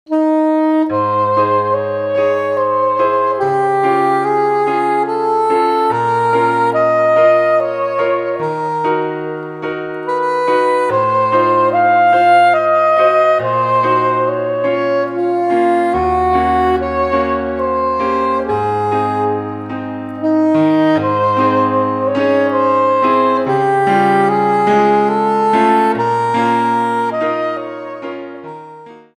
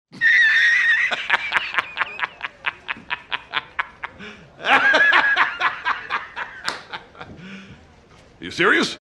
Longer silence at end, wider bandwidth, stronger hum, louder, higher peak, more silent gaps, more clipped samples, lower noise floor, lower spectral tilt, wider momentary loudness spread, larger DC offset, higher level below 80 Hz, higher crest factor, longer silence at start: first, 0.2 s vs 0.05 s; second, 10.5 kHz vs 12.5 kHz; neither; first, -14 LUFS vs -18 LUFS; about the same, 0 dBFS vs 0 dBFS; neither; neither; second, -36 dBFS vs -49 dBFS; first, -7 dB/octave vs -2.5 dB/octave; second, 8 LU vs 22 LU; neither; first, -44 dBFS vs -58 dBFS; second, 14 dB vs 22 dB; about the same, 0.1 s vs 0.15 s